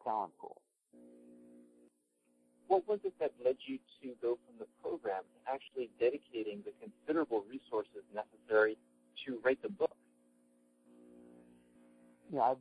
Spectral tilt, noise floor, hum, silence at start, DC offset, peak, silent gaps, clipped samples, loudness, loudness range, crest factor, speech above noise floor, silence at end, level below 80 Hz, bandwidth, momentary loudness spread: -6.5 dB/octave; -77 dBFS; none; 0.05 s; under 0.1%; -18 dBFS; none; under 0.1%; -38 LUFS; 4 LU; 22 dB; 39 dB; 0 s; -84 dBFS; 11 kHz; 15 LU